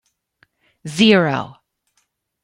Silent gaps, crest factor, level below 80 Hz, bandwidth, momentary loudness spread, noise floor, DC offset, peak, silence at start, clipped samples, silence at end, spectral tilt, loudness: none; 20 dB; -62 dBFS; 11.5 kHz; 22 LU; -68 dBFS; under 0.1%; 0 dBFS; 0.85 s; under 0.1%; 0.95 s; -5 dB/octave; -16 LUFS